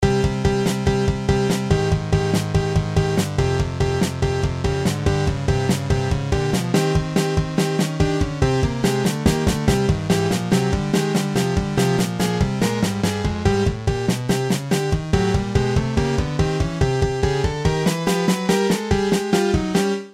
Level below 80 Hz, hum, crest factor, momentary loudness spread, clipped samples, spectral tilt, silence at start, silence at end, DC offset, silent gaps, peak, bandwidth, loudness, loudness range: -32 dBFS; none; 16 dB; 2 LU; under 0.1%; -6 dB/octave; 0 s; 0 s; 0.1%; none; -4 dBFS; 16 kHz; -20 LUFS; 1 LU